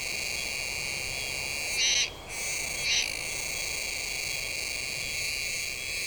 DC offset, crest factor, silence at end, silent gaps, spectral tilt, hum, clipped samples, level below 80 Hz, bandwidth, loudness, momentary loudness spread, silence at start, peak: under 0.1%; 18 dB; 0 s; none; 0.5 dB/octave; none; under 0.1%; -52 dBFS; over 20 kHz; -29 LUFS; 6 LU; 0 s; -14 dBFS